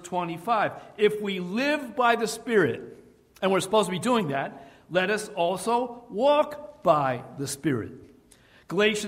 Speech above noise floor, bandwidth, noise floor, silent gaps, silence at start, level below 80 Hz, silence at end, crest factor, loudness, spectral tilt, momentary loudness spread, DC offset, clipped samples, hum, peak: 31 dB; 16 kHz; -56 dBFS; none; 0 s; -64 dBFS; 0 s; 20 dB; -26 LUFS; -4.5 dB/octave; 9 LU; under 0.1%; under 0.1%; none; -8 dBFS